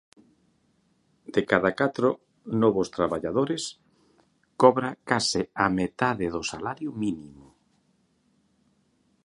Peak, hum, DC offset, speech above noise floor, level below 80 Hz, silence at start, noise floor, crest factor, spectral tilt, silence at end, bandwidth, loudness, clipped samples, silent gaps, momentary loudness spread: -2 dBFS; none; under 0.1%; 43 dB; -58 dBFS; 1.3 s; -68 dBFS; 26 dB; -5 dB/octave; 1.95 s; 11.5 kHz; -26 LUFS; under 0.1%; none; 11 LU